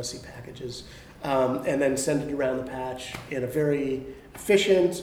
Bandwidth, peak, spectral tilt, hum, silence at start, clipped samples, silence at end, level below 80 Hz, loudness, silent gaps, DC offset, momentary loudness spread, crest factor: 18 kHz; -8 dBFS; -4.5 dB/octave; none; 0 s; under 0.1%; 0 s; -54 dBFS; -26 LUFS; none; under 0.1%; 17 LU; 18 dB